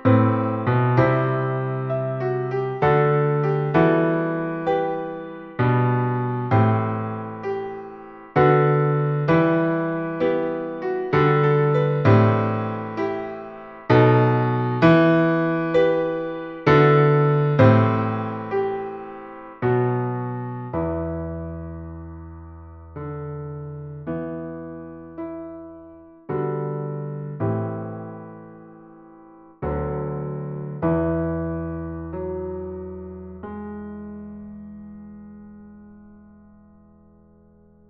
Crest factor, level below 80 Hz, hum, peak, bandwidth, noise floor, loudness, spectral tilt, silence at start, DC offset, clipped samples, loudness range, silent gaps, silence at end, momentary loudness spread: 20 dB; -48 dBFS; none; -2 dBFS; 6 kHz; -53 dBFS; -21 LUFS; -10 dB/octave; 0 s; under 0.1%; under 0.1%; 15 LU; none; 1.75 s; 20 LU